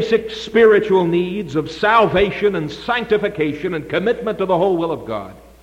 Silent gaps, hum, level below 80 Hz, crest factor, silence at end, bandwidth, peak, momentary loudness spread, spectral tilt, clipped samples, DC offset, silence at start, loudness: none; none; -44 dBFS; 14 dB; 0.25 s; 9.4 kHz; -2 dBFS; 11 LU; -6.5 dB/octave; under 0.1%; under 0.1%; 0 s; -17 LUFS